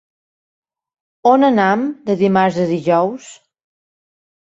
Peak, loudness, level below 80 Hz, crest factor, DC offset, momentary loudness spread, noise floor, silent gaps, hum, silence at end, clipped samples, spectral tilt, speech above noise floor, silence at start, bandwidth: -2 dBFS; -15 LUFS; -62 dBFS; 16 dB; under 0.1%; 8 LU; under -90 dBFS; none; none; 1.1 s; under 0.1%; -7 dB/octave; over 75 dB; 1.25 s; 8 kHz